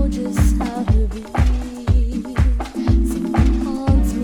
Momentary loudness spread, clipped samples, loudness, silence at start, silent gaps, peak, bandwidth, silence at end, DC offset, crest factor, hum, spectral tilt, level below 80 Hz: 4 LU; under 0.1%; -19 LUFS; 0 s; none; -2 dBFS; 13 kHz; 0 s; under 0.1%; 14 dB; none; -7.5 dB/octave; -20 dBFS